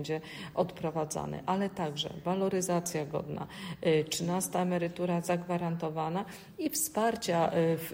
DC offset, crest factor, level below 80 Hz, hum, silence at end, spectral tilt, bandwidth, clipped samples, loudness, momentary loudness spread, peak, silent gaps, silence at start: under 0.1%; 16 dB; -64 dBFS; none; 0 s; -5 dB/octave; 16 kHz; under 0.1%; -32 LUFS; 8 LU; -16 dBFS; none; 0 s